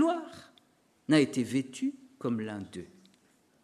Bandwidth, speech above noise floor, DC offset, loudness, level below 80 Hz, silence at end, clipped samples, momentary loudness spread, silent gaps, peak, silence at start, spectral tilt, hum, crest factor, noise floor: 13 kHz; 38 dB; under 0.1%; -31 LUFS; -74 dBFS; 0.8 s; under 0.1%; 21 LU; none; -12 dBFS; 0 s; -5.5 dB/octave; none; 20 dB; -68 dBFS